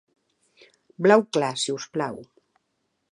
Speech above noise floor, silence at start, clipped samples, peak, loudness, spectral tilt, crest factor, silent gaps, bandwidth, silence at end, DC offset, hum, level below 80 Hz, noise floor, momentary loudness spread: 53 dB; 1 s; under 0.1%; -2 dBFS; -23 LUFS; -4.5 dB/octave; 24 dB; none; 11 kHz; 0.9 s; under 0.1%; none; -74 dBFS; -75 dBFS; 13 LU